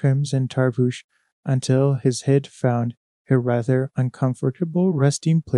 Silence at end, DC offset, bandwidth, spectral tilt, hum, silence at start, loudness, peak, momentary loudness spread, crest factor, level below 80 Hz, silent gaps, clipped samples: 0 s; under 0.1%; 11 kHz; -7 dB/octave; none; 0.05 s; -21 LUFS; -4 dBFS; 6 LU; 16 dB; -62 dBFS; 1.04-1.09 s, 1.32-1.43 s, 2.97-3.25 s; under 0.1%